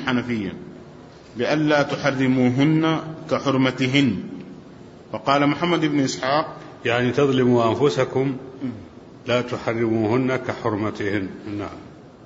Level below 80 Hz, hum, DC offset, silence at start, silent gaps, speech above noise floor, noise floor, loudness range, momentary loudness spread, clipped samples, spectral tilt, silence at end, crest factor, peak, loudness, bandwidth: -56 dBFS; none; under 0.1%; 0 s; none; 22 dB; -43 dBFS; 4 LU; 16 LU; under 0.1%; -6 dB/octave; 0 s; 18 dB; -4 dBFS; -21 LUFS; 8 kHz